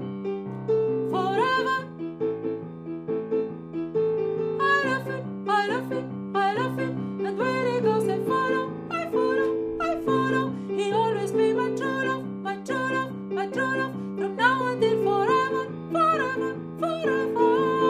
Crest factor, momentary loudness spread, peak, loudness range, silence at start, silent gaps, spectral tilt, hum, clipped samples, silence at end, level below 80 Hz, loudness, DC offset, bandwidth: 18 dB; 9 LU; -8 dBFS; 3 LU; 0 s; none; -6 dB/octave; none; under 0.1%; 0 s; -64 dBFS; -26 LUFS; under 0.1%; 14 kHz